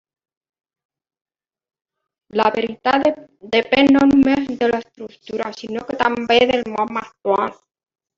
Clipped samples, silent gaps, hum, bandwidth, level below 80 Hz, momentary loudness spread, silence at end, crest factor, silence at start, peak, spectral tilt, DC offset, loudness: under 0.1%; none; none; 7.4 kHz; -52 dBFS; 13 LU; 0.65 s; 18 dB; 2.35 s; -2 dBFS; -5.5 dB/octave; under 0.1%; -18 LUFS